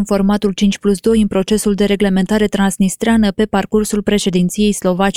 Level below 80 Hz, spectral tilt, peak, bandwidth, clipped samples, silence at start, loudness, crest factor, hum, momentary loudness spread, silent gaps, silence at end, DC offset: -34 dBFS; -5.5 dB/octave; -2 dBFS; 15 kHz; under 0.1%; 0 s; -15 LUFS; 12 dB; none; 2 LU; none; 0.05 s; under 0.1%